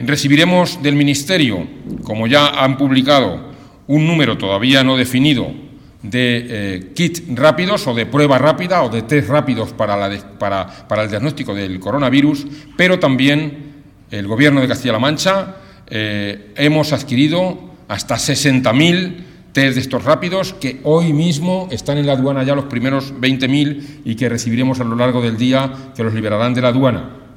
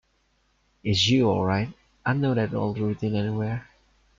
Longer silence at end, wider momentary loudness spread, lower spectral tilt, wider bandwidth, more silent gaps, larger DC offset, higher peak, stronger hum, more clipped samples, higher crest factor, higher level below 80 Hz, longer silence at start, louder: second, 0.15 s vs 0.55 s; about the same, 11 LU vs 11 LU; about the same, -5.5 dB/octave vs -5.5 dB/octave; first, 17 kHz vs 7.6 kHz; neither; neither; first, 0 dBFS vs -10 dBFS; neither; neither; about the same, 16 dB vs 16 dB; first, -48 dBFS vs -54 dBFS; second, 0 s vs 0.85 s; first, -15 LUFS vs -25 LUFS